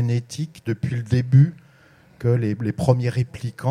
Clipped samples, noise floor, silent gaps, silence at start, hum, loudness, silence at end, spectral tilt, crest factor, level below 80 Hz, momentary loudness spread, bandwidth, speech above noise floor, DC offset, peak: under 0.1%; -52 dBFS; none; 0 s; none; -22 LUFS; 0 s; -8 dB/octave; 20 dB; -52 dBFS; 11 LU; 10.5 kHz; 32 dB; under 0.1%; -2 dBFS